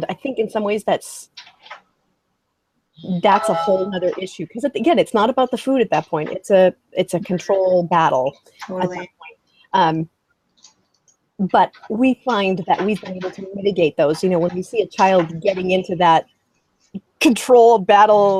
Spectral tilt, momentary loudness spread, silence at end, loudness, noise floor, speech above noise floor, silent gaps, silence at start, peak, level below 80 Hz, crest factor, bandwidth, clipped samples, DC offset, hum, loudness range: -5.5 dB/octave; 15 LU; 0 s; -18 LUFS; -71 dBFS; 54 dB; none; 0 s; 0 dBFS; -62 dBFS; 18 dB; 15 kHz; under 0.1%; under 0.1%; none; 5 LU